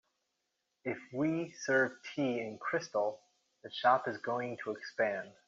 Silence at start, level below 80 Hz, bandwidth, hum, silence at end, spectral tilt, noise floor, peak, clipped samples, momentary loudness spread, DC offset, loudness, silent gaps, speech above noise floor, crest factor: 0.85 s; -82 dBFS; 7.6 kHz; none; 0.15 s; -3.5 dB/octave; -84 dBFS; -14 dBFS; under 0.1%; 11 LU; under 0.1%; -35 LUFS; none; 49 dB; 22 dB